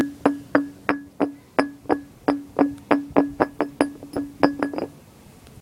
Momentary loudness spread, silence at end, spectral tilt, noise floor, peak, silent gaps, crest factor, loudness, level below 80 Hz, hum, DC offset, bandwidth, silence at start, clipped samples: 7 LU; 0.7 s; -6.5 dB/octave; -48 dBFS; 0 dBFS; none; 24 dB; -24 LUFS; -54 dBFS; none; under 0.1%; 15.5 kHz; 0 s; under 0.1%